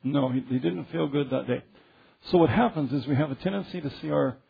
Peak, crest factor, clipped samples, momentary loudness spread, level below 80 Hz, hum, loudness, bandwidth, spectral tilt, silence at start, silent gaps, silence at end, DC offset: -8 dBFS; 18 dB; under 0.1%; 10 LU; -56 dBFS; none; -27 LUFS; 5 kHz; -10 dB/octave; 0 s; none; 0.15 s; under 0.1%